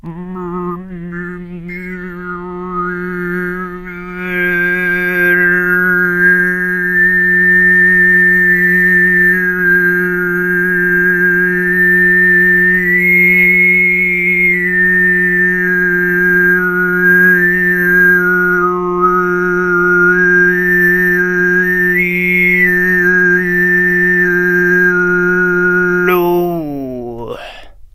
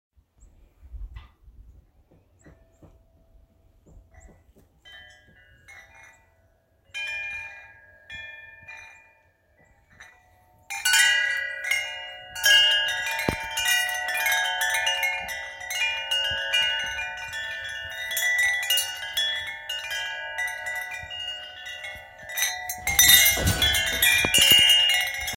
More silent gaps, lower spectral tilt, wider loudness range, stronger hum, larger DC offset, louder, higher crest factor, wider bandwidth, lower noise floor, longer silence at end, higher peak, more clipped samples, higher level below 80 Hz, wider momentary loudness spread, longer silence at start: neither; first, -7.5 dB/octave vs 0 dB/octave; second, 7 LU vs 18 LU; neither; neither; first, -10 LUFS vs -21 LUFS; second, 12 dB vs 26 dB; about the same, 15.5 kHz vs 17 kHz; second, -32 dBFS vs -63 dBFS; first, 0.25 s vs 0 s; about the same, 0 dBFS vs -2 dBFS; neither; first, -40 dBFS vs -48 dBFS; second, 16 LU vs 20 LU; second, 0.05 s vs 0.85 s